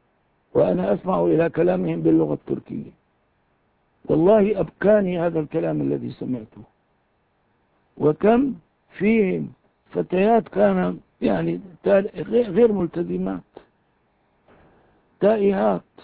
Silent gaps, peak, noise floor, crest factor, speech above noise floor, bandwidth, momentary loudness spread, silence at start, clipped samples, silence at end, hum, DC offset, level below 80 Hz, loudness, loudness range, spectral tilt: none; -4 dBFS; -66 dBFS; 16 dB; 46 dB; 4.7 kHz; 11 LU; 0.55 s; under 0.1%; 0.25 s; none; under 0.1%; -54 dBFS; -21 LUFS; 4 LU; -12 dB/octave